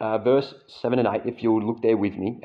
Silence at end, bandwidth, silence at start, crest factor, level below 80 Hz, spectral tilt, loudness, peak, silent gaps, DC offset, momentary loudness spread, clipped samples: 0.05 s; 5.6 kHz; 0 s; 14 dB; -66 dBFS; -9 dB/octave; -23 LUFS; -8 dBFS; none; under 0.1%; 6 LU; under 0.1%